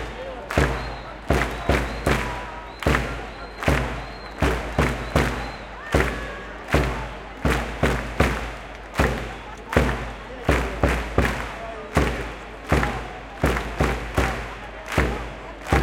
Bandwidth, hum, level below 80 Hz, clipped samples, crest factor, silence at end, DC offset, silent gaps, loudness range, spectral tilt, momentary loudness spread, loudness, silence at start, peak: 16.5 kHz; none; -30 dBFS; under 0.1%; 24 dB; 0 s; under 0.1%; none; 1 LU; -5.5 dB/octave; 11 LU; -25 LUFS; 0 s; 0 dBFS